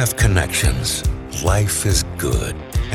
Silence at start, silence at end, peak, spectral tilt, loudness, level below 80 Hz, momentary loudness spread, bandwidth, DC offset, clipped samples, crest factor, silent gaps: 0 s; 0 s; -2 dBFS; -4 dB/octave; -19 LUFS; -24 dBFS; 7 LU; 18 kHz; under 0.1%; under 0.1%; 16 dB; none